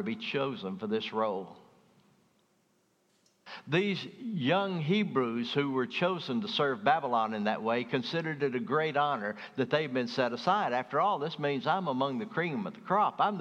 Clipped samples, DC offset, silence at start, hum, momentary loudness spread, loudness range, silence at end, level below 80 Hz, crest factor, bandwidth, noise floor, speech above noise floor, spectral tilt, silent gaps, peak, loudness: under 0.1%; under 0.1%; 0 s; none; 6 LU; 7 LU; 0 s; -86 dBFS; 20 dB; 8.8 kHz; -71 dBFS; 41 dB; -6.5 dB/octave; none; -10 dBFS; -31 LUFS